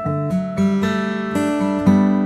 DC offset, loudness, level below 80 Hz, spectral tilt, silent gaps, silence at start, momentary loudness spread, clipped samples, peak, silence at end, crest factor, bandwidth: under 0.1%; -19 LUFS; -50 dBFS; -7.5 dB/octave; none; 0 s; 6 LU; under 0.1%; -2 dBFS; 0 s; 14 dB; 12 kHz